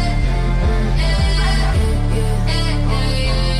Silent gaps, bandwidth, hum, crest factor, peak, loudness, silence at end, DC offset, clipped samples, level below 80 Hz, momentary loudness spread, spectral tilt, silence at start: none; 12 kHz; none; 10 dB; -6 dBFS; -18 LUFS; 0 s; under 0.1%; under 0.1%; -18 dBFS; 2 LU; -5.5 dB/octave; 0 s